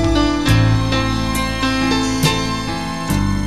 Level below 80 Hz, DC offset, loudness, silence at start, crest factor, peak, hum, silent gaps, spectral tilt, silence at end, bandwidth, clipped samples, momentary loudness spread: -26 dBFS; 2%; -17 LUFS; 0 s; 16 dB; -2 dBFS; none; none; -5 dB/octave; 0 s; 13.5 kHz; under 0.1%; 6 LU